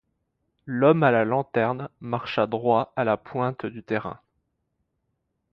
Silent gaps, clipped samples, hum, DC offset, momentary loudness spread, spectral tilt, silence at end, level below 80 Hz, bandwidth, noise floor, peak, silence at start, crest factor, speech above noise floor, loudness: none; under 0.1%; none; under 0.1%; 12 LU; -9 dB/octave; 1.35 s; -64 dBFS; 6 kHz; -76 dBFS; -6 dBFS; 0.65 s; 20 dB; 53 dB; -24 LUFS